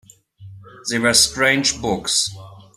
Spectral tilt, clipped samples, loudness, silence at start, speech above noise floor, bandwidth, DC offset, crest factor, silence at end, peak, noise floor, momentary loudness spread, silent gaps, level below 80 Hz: -1.5 dB/octave; under 0.1%; -17 LUFS; 0.4 s; 24 dB; 15.5 kHz; under 0.1%; 20 dB; 0.15 s; -2 dBFS; -43 dBFS; 11 LU; none; -48 dBFS